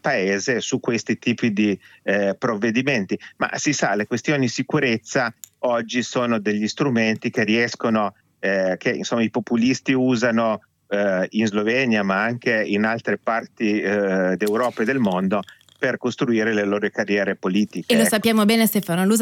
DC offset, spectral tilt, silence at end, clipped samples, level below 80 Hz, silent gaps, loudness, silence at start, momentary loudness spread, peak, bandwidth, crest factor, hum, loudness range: under 0.1%; -4.5 dB/octave; 0 s; under 0.1%; -68 dBFS; none; -21 LUFS; 0.05 s; 5 LU; -6 dBFS; 18 kHz; 14 dB; none; 2 LU